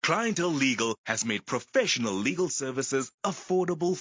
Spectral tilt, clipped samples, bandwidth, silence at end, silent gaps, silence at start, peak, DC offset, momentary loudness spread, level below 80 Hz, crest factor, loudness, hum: -3.5 dB/octave; under 0.1%; 7.8 kHz; 0 s; 0.98-1.04 s, 3.14-3.18 s; 0.05 s; -10 dBFS; under 0.1%; 4 LU; -70 dBFS; 18 dB; -28 LUFS; none